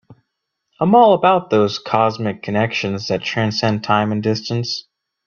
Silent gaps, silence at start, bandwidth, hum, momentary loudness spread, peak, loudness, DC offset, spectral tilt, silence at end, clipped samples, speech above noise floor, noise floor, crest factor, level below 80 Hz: none; 0.1 s; 7 kHz; none; 10 LU; 0 dBFS; -17 LUFS; under 0.1%; -6 dB/octave; 0.45 s; under 0.1%; 59 dB; -76 dBFS; 16 dB; -58 dBFS